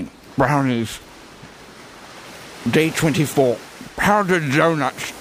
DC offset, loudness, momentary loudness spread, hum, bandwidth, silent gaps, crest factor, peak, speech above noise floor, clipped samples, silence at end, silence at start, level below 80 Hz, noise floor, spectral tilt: under 0.1%; -19 LUFS; 23 LU; none; 15.5 kHz; none; 18 dB; -2 dBFS; 23 dB; under 0.1%; 0 s; 0 s; -48 dBFS; -41 dBFS; -5.5 dB/octave